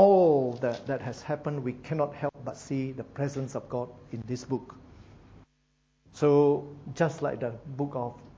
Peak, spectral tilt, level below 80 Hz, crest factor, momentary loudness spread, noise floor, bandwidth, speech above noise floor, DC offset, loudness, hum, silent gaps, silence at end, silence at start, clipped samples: -8 dBFS; -7.5 dB/octave; -62 dBFS; 20 dB; 14 LU; -71 dBFS; 8 kHz; 41 dB; under 0.1%; -29 LUFS; none; none; 0.1 s; 0 s; under 0.1%